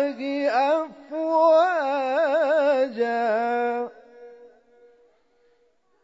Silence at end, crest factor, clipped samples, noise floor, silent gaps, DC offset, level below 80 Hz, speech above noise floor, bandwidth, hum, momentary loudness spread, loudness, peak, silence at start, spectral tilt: 1.55 s; 14 dB; under 0.1%; -66 dBFS; none; under 0.1%; -80 dBFS; 44 dB; 7.8 kHz; none; 10 LU; -22 LUFS; -10 dBFS; 0 s; -4.5 dB/octave